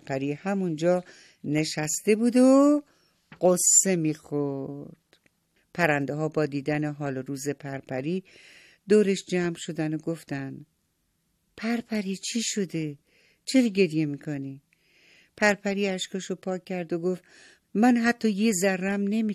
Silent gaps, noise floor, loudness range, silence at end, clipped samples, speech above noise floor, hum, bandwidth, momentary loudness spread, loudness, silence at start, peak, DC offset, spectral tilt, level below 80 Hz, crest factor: none; -73 dBFS; 8 LU; 0 s; under 0.1%; 48 dB; none; 14 kHz; 15 LU; -26 LUFS; 0.05 s; -8 dBFS; under 0.1%; -4.5 dB/octave; -70 dBFS; 18 dB